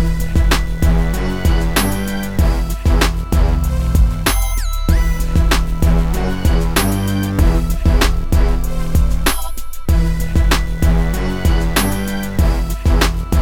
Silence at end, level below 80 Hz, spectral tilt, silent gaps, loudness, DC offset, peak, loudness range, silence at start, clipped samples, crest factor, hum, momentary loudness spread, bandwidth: 0 s; -16 dBFS; -5 dB/octave; none; -17 LUFS; under 0.1%; 0 dBFS; 1 LU; 0 s; under 0.1%; 14 dB; none; 4 LU; 20 kHz